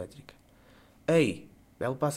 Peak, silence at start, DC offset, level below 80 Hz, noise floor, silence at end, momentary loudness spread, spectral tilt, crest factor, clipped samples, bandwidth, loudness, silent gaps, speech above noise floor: -14 dBFS; 0 s; under 0.1%; -64 dBFS; -58 dBFS; 0 s; 18 LU; -6 dB/octave; 18 dB; under 0.1%; 15.5 kHz; -29 LUFS; none; 30 dB